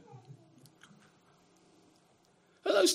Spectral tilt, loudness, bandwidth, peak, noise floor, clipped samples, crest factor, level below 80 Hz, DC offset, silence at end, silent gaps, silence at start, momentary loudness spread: -2 dB/octave; -31 LUFS; 15.5 kHz; -16 dBFS; -67 dBFS; under 0.1%; 22 dB; -88 dBFS; under 0.1%; 0 s; none; 0.3 s; 30 LU